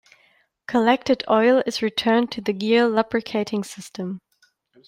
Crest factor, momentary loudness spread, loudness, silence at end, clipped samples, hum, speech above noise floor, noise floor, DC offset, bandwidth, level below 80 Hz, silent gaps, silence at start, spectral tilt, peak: 18 dB; 14 LU; -21 LUFS; 0.7 s; under 0.1%; none; 43 dB; -64 dBFS; under 0.1%; 15.5 kHz; -64 dBFS; none; 0.7 s; -5 dB/octave; -4 dBFS